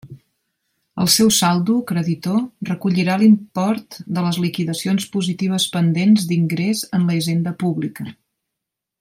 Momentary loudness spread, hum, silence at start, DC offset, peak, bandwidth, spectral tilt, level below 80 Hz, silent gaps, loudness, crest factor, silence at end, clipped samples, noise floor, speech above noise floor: 10 LU; none; 0.05 s; under 0.1%; -2 dBFS; 16.5 kHz; -5 dB/octave; -60 dBFS; none; -18 LUFS; 18 dB; 0.9 s; under 0.1%; -82 dBFS; 64 dB